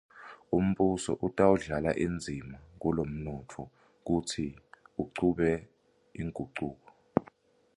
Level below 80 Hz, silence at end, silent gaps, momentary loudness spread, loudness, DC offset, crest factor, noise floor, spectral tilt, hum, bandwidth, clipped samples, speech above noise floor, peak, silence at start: -52 dBFS; 0.55 s; none; 19 LU; -32 LUFS; under 0.1%; 24 dB; -60 dBFS; -6.5 dB/octave; none; 11.5 kHz; under 0.1%; 30 dB; -8 dBFS; 0.15 s